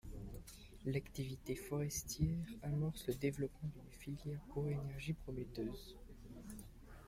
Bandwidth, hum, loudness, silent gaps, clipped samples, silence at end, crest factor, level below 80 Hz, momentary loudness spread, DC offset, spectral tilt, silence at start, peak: 16 kHz; none; -44 LUFS; none; under 0.1%; 0 s; 20 dB; -56 dBFS; 15 LU; under 0.1%; -6 dB/octave; 0.05 s; -24 dBFS